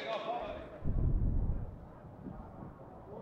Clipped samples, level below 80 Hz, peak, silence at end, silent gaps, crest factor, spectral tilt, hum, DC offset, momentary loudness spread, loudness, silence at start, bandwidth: under 0.1%; -38 dBFS; -20 dBFS; 0 s; none; 16 dB; -8.5 dB/octave; none; under 0.1%; 16 LU; -39 LUFS; 0 s; 6 kHz